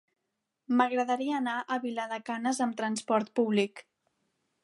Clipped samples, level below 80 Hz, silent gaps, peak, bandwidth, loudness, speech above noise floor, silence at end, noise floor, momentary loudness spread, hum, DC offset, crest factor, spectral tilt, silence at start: under 0.1%; -84 dBFS; none; -10 dBFS; 11.5 kHz; -30 LUFS; 54 dB; 0.85 s; -84 dBFS; 7 LU; none; under 0.1%; 20 dB; -4.5 dB/octave; 0.7 s